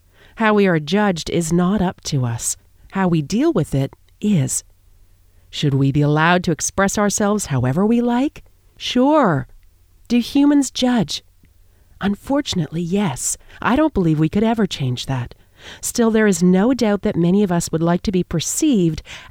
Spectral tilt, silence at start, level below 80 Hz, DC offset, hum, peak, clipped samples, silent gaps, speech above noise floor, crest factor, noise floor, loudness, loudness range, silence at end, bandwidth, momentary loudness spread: -5 dB/octave; 0.35 s; -42 dBFS; under 0.1%; none; -2 dBFS; under 0.1%; none; 33 dB; 16 dB; -51 dBFS; -18 LUFS; 3 LU; 0.05 s; 17 kHz; 9 LU